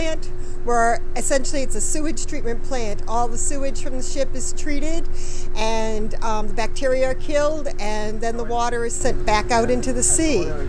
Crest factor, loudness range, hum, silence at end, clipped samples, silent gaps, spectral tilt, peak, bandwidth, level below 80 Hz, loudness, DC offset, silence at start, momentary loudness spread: 12 dB; 5 LU; none; 0 s; under 0.1%; none; -3.5 dB/octave; -4 dBFS; 11 kHz; -22 dBFS; -23 LUFS; under 0.1%; 0 s; 9 LU